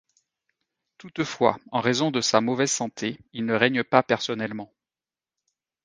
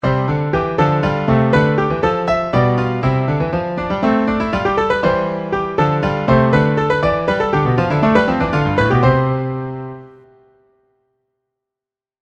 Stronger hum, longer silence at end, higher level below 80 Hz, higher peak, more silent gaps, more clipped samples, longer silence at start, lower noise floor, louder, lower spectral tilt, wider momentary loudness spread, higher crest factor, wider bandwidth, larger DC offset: neither; second, 1.2 s vs 2.15 s; second, -68 dBFS vs -36 dBFS; about the same, 0 dBFS vs 0 dBFS; neither; neither; first, 1 s vs 0.05 s; about the same, under -90 dBFS vs -88 dBFS; second, -24 LUFS vs -16 LUFS; second, -3.5 dB/octave vs -8 dB/octave; first, 11 LU vs 7 LU; first, 26 dB vs 16 dB; first, 10 kHz vs 7.6 kHz; neither